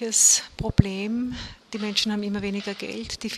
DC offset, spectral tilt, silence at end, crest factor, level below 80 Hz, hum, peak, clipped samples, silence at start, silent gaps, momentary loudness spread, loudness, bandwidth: under 0.1%; -3 dB/octave; 0 s; 24 dB; -42 dBFS; none; -2 dBFS; under 0.1%; 0 s; none; 16 LU; -23 LUFS; 14 kHz